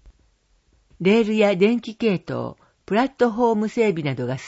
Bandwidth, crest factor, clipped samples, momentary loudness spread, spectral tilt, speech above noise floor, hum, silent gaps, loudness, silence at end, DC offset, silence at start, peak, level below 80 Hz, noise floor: 8 kHz; 16 dB; under 0.1%; 8 LU; -7 dB/octave; 42 dB; none; none; -21 LUFS; 0 s; under 0.1%; 0.05 s; -6 dBFS; -58 dBFS; -62 dBFS